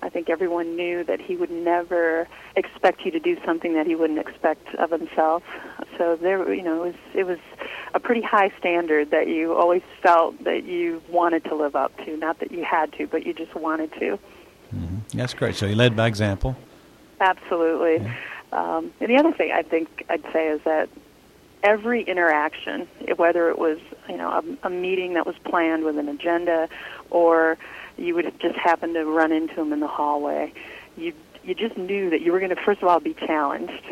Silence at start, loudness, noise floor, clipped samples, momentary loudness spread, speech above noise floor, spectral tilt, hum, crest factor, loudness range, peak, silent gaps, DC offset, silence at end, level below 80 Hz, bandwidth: 0 s; -23 LUFS; -52 dBFS; under 0.1%; 11 LU; 29 dB; -6.5 dB/octave; none; 18 dB; 4 LU; -6 dBFS; none; under 0.1%; 0 s; -50 dBFS; 13.5 kHz